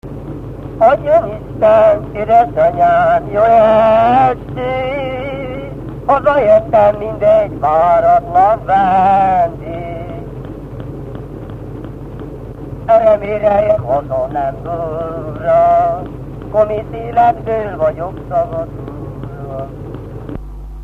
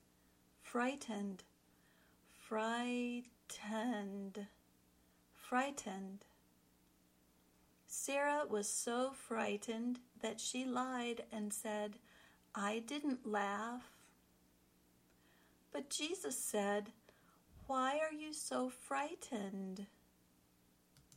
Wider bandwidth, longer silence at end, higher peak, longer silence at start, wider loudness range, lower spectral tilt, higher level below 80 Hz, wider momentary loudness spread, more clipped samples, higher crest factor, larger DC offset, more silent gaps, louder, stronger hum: second, 4.9 kHz vs 16.5 kHz; about the same, 0 s vs 0 s; first, 0 dBFS vs -26 dBFS; second, 0.05 s vs 0.6 s; about the same, 7 LU vs 5 LU; first, -8.5 dB/octave vs -3 dB/octave; first, -34 dBFS vs -80 dBFS; first, 18 LU vs 14 LU; neither; about the same, 14 dB vs 18 dB; neither; neither; first, -13 LUFS vs -42 LUFS; second, none vs 60 Hz at -80 dBFS